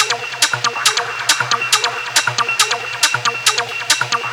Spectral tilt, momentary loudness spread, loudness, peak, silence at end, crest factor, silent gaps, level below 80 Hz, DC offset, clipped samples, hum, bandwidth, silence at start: 0.5 dB/octave; 2 LU; -15 LUFS; 0 dBFS; 0 s; 18 dB; none; -62 dBFS; under 0.1%; under 0.1%; none; over 20 kHz; 0 s